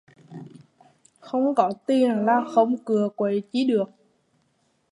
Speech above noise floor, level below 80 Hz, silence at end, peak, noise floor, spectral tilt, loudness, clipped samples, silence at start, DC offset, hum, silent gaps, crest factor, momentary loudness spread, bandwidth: 46 dB; -78 dBFS; 1.05 s; -4 dBFS; -68 dBFS; -7 dB/octave; -23 LUFS; under 0.1%; 0.3 s; under 0.1%; none; none; 20 dB; 20 LU; 11 kHz